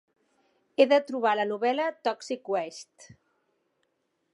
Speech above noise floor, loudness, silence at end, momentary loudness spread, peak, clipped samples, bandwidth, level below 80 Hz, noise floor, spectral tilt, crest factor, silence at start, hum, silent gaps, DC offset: 49 dB; -27 LUFS; 1.5 s; 14 LU; -6 dBFS; under 0.1%; 11.5 kHz; -82 dBFS; -76 dBFS; -4 dB/octave; 22 dB; 0.8 s; none; none; under 0.1%